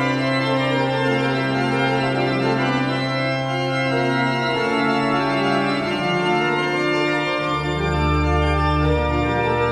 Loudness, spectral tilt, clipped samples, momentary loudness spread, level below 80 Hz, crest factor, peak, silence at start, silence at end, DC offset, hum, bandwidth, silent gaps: -20 LUFS; -6 dB/octave; under 0.1%; 2 LU; -32 dBFS; 12 dB; -8 dBFS; 0 s; 0 s; under 0.1%; none; 12 kHz; none